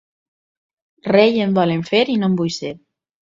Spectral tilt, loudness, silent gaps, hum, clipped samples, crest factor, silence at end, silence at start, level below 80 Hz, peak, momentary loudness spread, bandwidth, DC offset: -6 dB/octave; -17 LUFS; none; none; under 0.1%; 18 dB; 0.5 s; 1.05 s; -60 dBFS; 0 dBFS; 14 LU; 7.6 kHz; under 0.1%